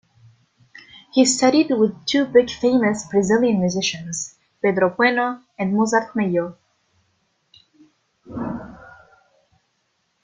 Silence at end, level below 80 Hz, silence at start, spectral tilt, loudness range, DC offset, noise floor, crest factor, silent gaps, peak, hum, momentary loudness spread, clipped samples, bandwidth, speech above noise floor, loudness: 1.45 s; -58 dBFS; 1.15 s; -4.5 dB/octave; 19 LU; under 0.1%; -69 dBFS; 18 dB; none; -2 dBFS; none; 13 LU; under 0.1%; 9.6 kHz; 51 dB; -19 LUFS